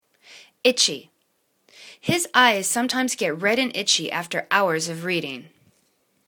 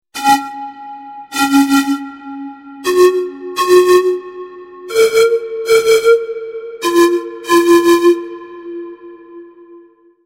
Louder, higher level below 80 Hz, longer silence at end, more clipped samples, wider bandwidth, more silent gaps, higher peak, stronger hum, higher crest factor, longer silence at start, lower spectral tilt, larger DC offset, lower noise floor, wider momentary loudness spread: second, -21 LUFS vs -13 LUFS; second, -70 dBFS vs -56 dBFS; first, 0.85 s vs 0.45 s; neither; first, 19 kHz vs 16.5 kHz; neither; about the same, 0 dBFS vs 0 dBFS; neither; first, 24 dB vs 14 dB; first, 0.3 s vs 0.15 s; about the same, -2 dB/octave vs -2.5 dB/octave; neither; first, -69 dBFS vs -44 dBFS; second, 10 LU vs 21 LU